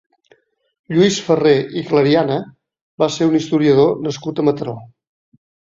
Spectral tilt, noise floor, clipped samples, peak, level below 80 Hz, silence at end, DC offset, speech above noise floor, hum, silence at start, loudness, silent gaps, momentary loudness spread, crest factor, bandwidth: -6 dB/octave; -56 dBFS; under 0.1%; -2 dBFS; -56 dBFS; 0.9 s; under 0.1%; 41 dB; none; 0.9 s; -16 LUFS; 2.81-2.98 s; 10 LU; 16 dB; 7.8 kHz